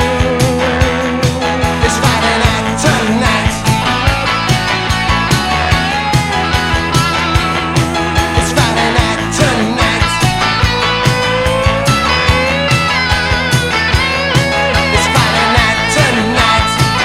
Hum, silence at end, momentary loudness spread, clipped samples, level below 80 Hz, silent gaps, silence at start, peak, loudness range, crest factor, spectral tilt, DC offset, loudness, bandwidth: none; 0 s; 3 LU; under 0.1%; -24 dBFS; none; 0 s; 0 dBFS; 2 LU; 12 dB; -4 dB/octave; under 0.1%; -12 LUFS; 16.5 kHz